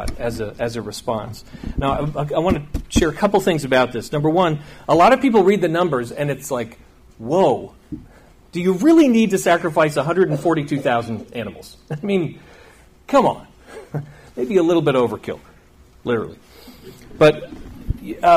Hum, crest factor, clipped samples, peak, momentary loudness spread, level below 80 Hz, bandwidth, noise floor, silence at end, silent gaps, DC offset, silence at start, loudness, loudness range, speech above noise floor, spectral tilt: none; 16 dB; under 0.1%; -4 dBFS; 17 LU; -38 dBFS; 15.5 kHz; -49 dBFS; 0 s; none; under 0.1%; 0 s; -18 LUFS; 6 LU; 31 dB; -6 dB/octave